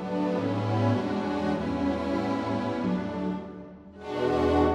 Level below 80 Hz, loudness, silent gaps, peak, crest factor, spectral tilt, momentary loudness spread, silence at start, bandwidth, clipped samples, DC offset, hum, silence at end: -46 dBFS; -28 LUFS; none; -10 dBFS; 16 dB; -8 dB/octave; 11 LU; 0 s; 10 kHz; under 0.1%; under 0.1%; none; 0 s